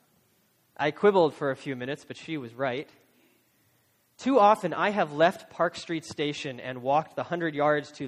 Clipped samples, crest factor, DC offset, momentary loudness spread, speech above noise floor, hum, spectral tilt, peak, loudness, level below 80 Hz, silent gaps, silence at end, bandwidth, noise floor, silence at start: under 0.1%; 20 dB; under 0.1%; 14 LU; 41 dB; none; -5.5 dB/octave; -8 dBFS; -27 LUFS; -72 dBFS; none; 0 s; 15 kHz; -68 dBFS; 0.8 s